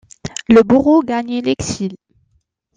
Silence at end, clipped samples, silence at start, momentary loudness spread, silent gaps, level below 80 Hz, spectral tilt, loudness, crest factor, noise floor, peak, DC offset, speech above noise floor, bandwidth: 0.8 s; under 0.1%; 0.25 s; 16 LU; none; -46 dBFS; -5.5 dB/octave; -14 LUFS; 14 dB; -63 dBFS; 0 dBFS; under 0.1%; 50 dB; 9.6 kHz